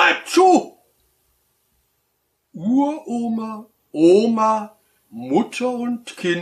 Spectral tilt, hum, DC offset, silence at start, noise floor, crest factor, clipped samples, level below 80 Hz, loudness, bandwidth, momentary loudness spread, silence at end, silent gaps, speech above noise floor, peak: -4.5 dB/octave; none; under 0.1%; 0 s; -70 dBFS; 18 dB; under 0.1%; -72 dBFS; -19 LUFS; 13 kHz; 20 LU; 0 s; none; 52 dB; -2 dBFS